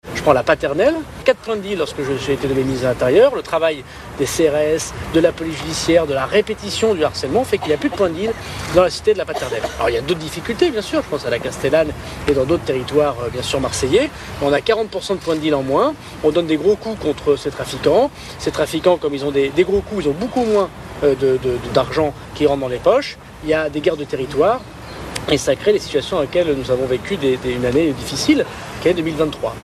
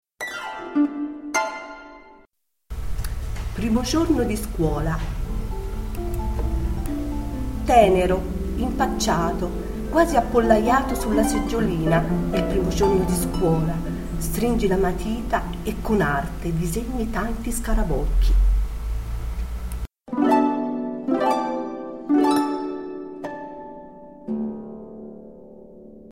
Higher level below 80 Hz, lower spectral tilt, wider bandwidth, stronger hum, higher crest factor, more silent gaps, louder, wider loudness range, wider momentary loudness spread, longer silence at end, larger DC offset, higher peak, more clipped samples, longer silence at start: second, -40 dBFS vs -28 dBFS; about the same, -5 dB/octave vs -6 dB/octave; second, 14 kHz vs 16.5 kHz; neither; about the same, 18 dB vs 20 dB; neither; first, -18 LUFS vs -23 LUFS; second, 2 LU vs 7 LU; second, 7 LU vs 15 LU; about the same, 0 s vs 0 s; neither; about the same, 0 dBFS vs -2 dBFS; neither; second, 0.05 s vs 0.2 s